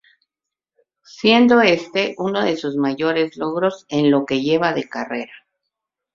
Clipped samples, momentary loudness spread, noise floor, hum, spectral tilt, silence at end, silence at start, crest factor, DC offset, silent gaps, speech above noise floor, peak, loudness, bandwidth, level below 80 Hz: under 0.1%; 13 LU; -86 dBFS; none; -5.5 dB/octave; 0.8 s; 1.2 s; 18 dB; under 0.1%; none; 68 dB; -2 dBFS; -18 LUFS; 7.4 kHz; -62 dBFS